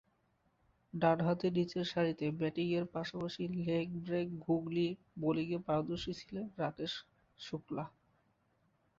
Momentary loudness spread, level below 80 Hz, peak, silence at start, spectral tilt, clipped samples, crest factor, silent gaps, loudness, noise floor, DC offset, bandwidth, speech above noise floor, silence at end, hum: 11 LU; -68 dBFS; -16 dBFS; 0.95 s; -5.5 dB/octave; under 0.1%; 22 dB; none; -37 LUFS; -76 dBFS; under 0.1%; 7.6 kHz; 40 dB; 1.1 s; none